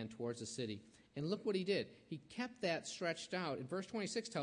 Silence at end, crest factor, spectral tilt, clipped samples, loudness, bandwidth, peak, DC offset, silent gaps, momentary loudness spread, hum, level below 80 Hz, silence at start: 0 s; 18 dB; -4.5 dB/octave; under 0.1%; -42 LUFS; 10.5 kHz; -26 dBFS; under 0.1%; none; 9 LU; none; -80 dBFS; 0 s